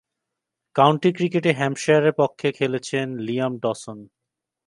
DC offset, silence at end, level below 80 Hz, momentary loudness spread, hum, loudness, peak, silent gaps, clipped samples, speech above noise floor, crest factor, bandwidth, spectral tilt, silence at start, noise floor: under 0.1%; 0.6 s; -70 dBFS; 10 LU; none; -21 LUFS; 0 dBFS; none; under 0.1%; 63 dB; 22 dB; 11.5 kHz; -6 dB/octave; 0.75 s; -84 dBFS